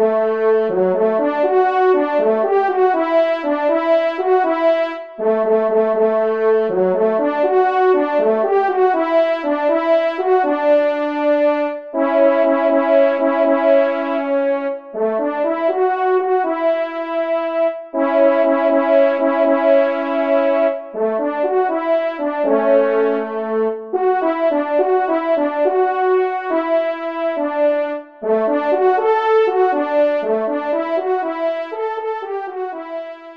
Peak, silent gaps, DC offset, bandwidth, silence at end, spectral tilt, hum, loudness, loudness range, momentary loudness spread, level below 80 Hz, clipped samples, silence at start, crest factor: -2 dBFS; none; 0.2%; 6 kHz; 0 s; -7.5 dB/octave; none; -17 LUFS; 3 LU; 7 LU; -70 dBFS; under 0.1%; 0 s; 14 dB